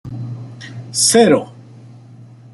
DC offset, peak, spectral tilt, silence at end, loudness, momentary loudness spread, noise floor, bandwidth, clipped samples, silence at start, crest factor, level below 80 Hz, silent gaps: under 0.1%; 0 dBFS; -3.5 dB/octave; 0.3 s; -13 LUFS; 22 LU; -40 dBFS; 12.5 kHz; under 0.1%; 0.05 s; 18 dB; -56 dBFS; none